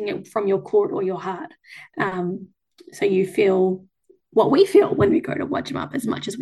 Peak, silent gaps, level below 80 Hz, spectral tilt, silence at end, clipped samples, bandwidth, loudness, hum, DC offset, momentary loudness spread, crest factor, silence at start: -4 dBFS; none; -58 dBFS; -6.5 dB/octave; 0 s; under 0.1%; 12.5 kHz; -21 LUFS; none; under 0.1%; 14 LU; 16 dB; 0 s